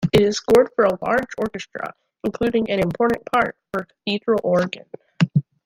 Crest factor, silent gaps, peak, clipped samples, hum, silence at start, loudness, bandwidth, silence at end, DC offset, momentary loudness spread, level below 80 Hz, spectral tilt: 18 dB; none; -2 dBFS; under 0.1%; none; 0 s; -21 LUFS; 16.5 kHz; 0.25 s; under 0.1%; 13 LU; -50 dBFS; -6 dB/octave